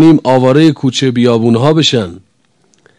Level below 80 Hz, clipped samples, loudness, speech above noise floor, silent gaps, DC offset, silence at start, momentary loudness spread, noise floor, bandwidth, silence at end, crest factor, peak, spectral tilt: -52 dBFS; 2%; -10 LUFS; 46 dB; none; under 0.1%; 0 s; 5 LU; -55 dBFS; 10.5 kHz; 0.8 s; 10 dB; 0 dBFS; -6 dB/octave